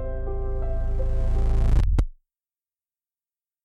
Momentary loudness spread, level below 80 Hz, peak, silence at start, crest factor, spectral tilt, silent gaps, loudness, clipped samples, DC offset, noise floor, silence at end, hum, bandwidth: 8 LU; -24 dBFS; -8 dBFS; 0 s; 16 dB; -8.5 dB/octave; none; -27 LUFS; under 0.1%; under 0.1%; under -90 dBFS; 1.55 s; none; 5.8 kHz